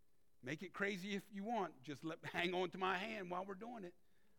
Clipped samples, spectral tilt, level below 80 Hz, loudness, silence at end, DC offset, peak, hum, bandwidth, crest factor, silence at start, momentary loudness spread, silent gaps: under 0.1%; -5 dB/octave; -80 dBFS; -44 LUFS; 0.45 s; under 0.1%; -26 dBFS; none; 18 kHz; 20 dB; 0.45 s; 10 LU; none